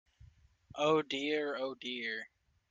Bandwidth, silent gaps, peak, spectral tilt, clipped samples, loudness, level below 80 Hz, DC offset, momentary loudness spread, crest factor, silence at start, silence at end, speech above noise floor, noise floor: 7.6 kHz; none; -18 dBFS; -4.5 dB/octave; under 0.1%; -35 LUFS; -72 dBFS; under 0.1%; 13 LU; 20 dB; 0.2 s; 0.45 s; 27 dB; -62 dBFS